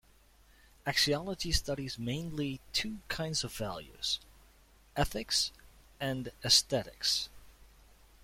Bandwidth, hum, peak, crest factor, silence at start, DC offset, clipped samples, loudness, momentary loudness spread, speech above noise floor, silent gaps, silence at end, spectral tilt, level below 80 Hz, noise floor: 16.5 kHz; none; -12 dBFS; 24 dB; 0.85 s; under 0.1%; under 0.1%; -32 LUFS; 12 LU; 29 dB; none; 0.55 s; -2.5 dB/octave; -50 dBFS; -62 dBFS